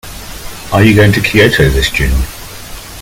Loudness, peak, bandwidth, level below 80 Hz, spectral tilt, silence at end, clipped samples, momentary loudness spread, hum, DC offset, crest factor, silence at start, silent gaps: -9 LUFS; 0 dBFS; 17 kHz; -20 dBFS; -5.5 dB/octave; 0 s; 0.4%; 20 LU; none; under 0.1%; 12 dB; 0.05 s; none